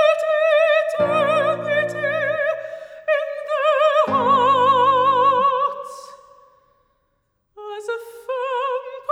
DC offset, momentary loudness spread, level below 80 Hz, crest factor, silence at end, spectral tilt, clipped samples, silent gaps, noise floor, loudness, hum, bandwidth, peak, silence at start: under 0.1%; 15 LU; -72 dBFS; 14 dB; 0 s; -4.5 dB/octave; under 0.1%; none; -69 dBFS; -19 LUFS; none; 11.5 kHz; -6 dBFS; 0 s